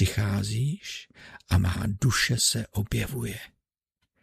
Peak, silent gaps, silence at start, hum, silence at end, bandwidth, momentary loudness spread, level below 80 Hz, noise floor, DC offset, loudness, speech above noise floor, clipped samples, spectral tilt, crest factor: -10 dBFS; none; 0 s; none; 0.75 s; 15.5 kHz; 15 LU; -42 dBFS; -80 dBFS; under 0.1%; -27 LUFS; 53 dB; under 0.1%; -4 dB/octave; 18 dB